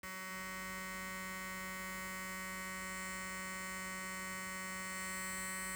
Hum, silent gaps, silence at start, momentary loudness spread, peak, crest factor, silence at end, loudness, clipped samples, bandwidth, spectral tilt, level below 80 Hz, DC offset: none; none; 0.05 s; 3 LU; -32 dBFS; 12 dB; 0 s; -42 LUFS; under 0.1%; over 20 kHz; -2 dB/octave; -64 dBFS; under 0.1%